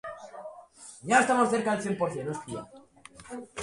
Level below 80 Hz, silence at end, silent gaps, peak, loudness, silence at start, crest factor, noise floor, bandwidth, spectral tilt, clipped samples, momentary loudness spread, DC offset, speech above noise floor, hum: -66 dBFS; 0 s; none; -8 dBFS; -27 LUFS; 0.05 s; 22 dB; -52 dBFS; 11.5 kHz; -4.5 dB/octave; under 0.1%; 23 LU; under 0.1%; 24 dB; none